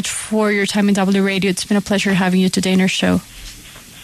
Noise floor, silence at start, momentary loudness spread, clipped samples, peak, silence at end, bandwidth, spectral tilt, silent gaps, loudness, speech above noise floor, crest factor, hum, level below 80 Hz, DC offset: -38 dBFS; 0 s; 19 LU; under 0.1%; -4 dBFS; 0 s; 13.5 kHz; -4.5 dB/octave; none; -16 LUFS; 22 dB; 14 dB; none; -46 dBFS; under 0.1%